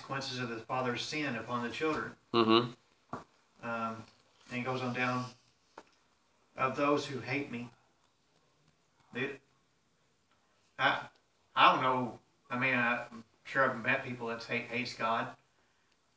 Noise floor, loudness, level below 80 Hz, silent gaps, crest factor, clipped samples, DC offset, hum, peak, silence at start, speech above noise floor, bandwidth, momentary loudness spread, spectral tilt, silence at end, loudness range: -74 dBFS; -33 LUFS; -74 dBFS; none; 26 dB; under 0.1%; under 0.1%; none; -10 dBFS; 0 s; 41 dB; 8 kHz; 19 LU; -5 dB/octave; 0.8 s; 8 LU